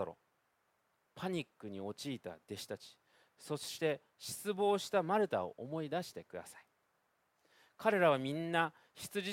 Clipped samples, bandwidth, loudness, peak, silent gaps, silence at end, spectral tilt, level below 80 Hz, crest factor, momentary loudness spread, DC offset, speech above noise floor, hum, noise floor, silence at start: under 0.1%; 16.5 kHz; -38 LUFS; -14 dBFS; none; 0 s; -4.5 dB/octave; -80 dBFS; 24 dB; 17 LU; under 0.1%; 42 dB; none; -79 dBFS; 0 s